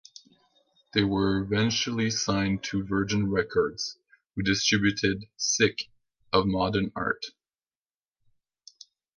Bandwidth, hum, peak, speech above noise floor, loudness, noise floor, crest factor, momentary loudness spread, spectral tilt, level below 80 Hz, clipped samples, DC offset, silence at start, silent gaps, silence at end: 10.5 kHz; none; -8 dBFS; over 64 dB; -27 LUFS; under -90 dBFS; 20 dB; 9 LU; -4 dB/octave; -52 dBFS; under 0.1%; under 0.1%; 0.95 s; none; 1.9 s